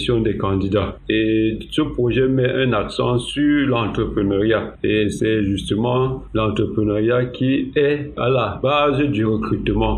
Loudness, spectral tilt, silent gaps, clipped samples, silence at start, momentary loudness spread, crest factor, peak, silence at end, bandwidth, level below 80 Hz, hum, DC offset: -19 LUFS; -7 dB/octave; none; under 0.1%; 0 s; 4 LU; 16 dB; -4 dBFS; 0 s; 10.5 kHz; -36 dBFS; none; under 0.1%